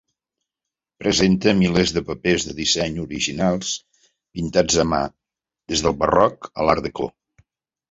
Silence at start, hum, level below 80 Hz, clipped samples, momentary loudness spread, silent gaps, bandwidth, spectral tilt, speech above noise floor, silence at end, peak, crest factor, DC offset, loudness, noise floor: 1 s; none; -42 dBFS; under 0.1%; 11 LU; none; 8 kHz; -4 dB/octave; 66 dB; 0.85 s; -2 dBFS; 20 dB; under 0.1%; -20 LUFS; -86 dBFS